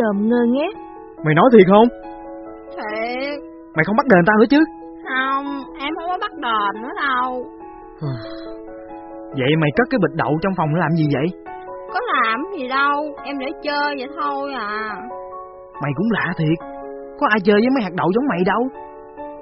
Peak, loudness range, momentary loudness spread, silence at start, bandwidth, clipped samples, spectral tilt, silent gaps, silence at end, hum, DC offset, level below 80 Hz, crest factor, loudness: 0 dBFS; 7 LU; 20 LU; 0 s; 5.8 kHz; under 0.1%; -5 dB/octave; none; 0 s; none; under 0.1%; -52 dBFS; 20 dB; -18 LUFS